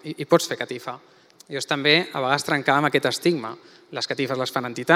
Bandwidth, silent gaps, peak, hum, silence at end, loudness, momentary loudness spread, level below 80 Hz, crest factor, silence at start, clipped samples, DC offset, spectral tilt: 16 kHz; none; 0 dBFS; none; 0 s; -22 LUFS; 17 LU; -76 dBFS; 22 dB; 0.05 s; under 0.1%; under 0.1%; -4 dB/octave